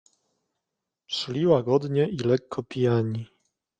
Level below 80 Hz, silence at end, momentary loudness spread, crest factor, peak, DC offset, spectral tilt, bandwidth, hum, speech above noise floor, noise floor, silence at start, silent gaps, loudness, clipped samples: -64 dBFS; 0.55 s; 11 LU; 20 dB; -8 dBFS; under 0.1%; -7 dB/octave; 9 kHz; none; 61 dB; -85 dBFS; 1.1 s; none; -25 LUFS; under 0.1%